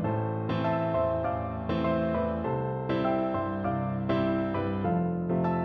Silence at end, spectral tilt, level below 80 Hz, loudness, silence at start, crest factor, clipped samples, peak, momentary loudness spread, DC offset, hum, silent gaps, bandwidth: 0 s; -10 dB/octave; -48 dBFS; -29 LUFS; 0 s; 12 dB; under 0.1%; -16 dBFS; 3 LU; under 0.1%; none; none; 5.8 kHz